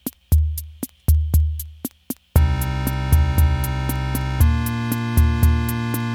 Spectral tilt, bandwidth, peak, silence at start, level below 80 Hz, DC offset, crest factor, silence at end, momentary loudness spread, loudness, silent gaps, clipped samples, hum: -6 dB/octave; 19 kHz; -2 dBFS; 0.05 s; -22 dBFS; under 0.1%; 16 dB; 0 s; 11 LU; -21 LUFS; none; under 0.1%; none